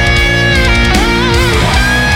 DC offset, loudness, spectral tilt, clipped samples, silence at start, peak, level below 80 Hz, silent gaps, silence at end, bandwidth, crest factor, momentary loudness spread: under 0.1%; -9 LUFS; -4.5 dB/octave; under 0.1%; 0 s; 0 dBFS; -16 dBFS; none; 0 s; 16.5 kHz; 8 dB; 1 LU